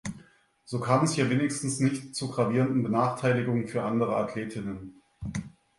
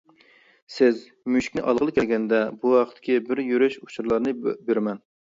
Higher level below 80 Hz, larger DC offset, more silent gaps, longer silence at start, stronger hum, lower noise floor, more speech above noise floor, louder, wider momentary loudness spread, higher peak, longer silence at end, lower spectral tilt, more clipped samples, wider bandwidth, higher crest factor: about the same, -58 dBFS vs -60 dBFS; neither; neither; second, 0.05 s vs 0.7 s; neither; about the same, -58 dBFS vs -57 dBFS; about the same, 31 dB vs 34 dB; second, -28 LUFS vs -23 LUFS; first, 13 LU vs 8 LU; about the same, -8 dBFS vs -6 dBFS; about the same, 0.3 s vs 0.4 s; about the same, -6 dB/octave vs -6 dB/octave; neither; first, 11.5 kHz vs 7.8 kHz; about the same, 20 dB vs 18 dB